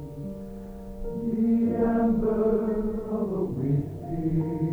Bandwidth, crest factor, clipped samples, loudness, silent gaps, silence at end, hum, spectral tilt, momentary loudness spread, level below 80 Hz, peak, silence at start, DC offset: 3.6 kHz; 14 dB; under 0.1%; -26 LUFS; none; 0 s; none; -11 dB/octave; 15 LU; -42 dBFS; -12 dBFS; 0 s; under 0.1%